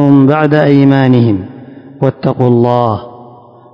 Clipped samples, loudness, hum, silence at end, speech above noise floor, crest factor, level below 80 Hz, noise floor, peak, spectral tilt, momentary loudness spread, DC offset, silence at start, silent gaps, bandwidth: 2%; -10 LUFS; none; 0.5 s; 28 dB; 10 dB; -44 dBFS; -37 dBFS; 0 dBFS; -10 dB/octave; 9 LU; under 0.1%; 0 s; none; 5.4 kHz